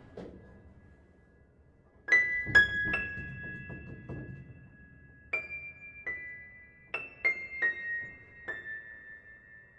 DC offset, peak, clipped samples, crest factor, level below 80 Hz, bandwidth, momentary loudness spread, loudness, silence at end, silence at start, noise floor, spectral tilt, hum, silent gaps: under 0.1%; -12 dBFS; under 0.1%; 24 dB; -58 dBFS; 9.4 kHz; 25 LU; -30 LUFS; 0.15 s; 0 s; -62 dBFS; -4 dB/octave; none; none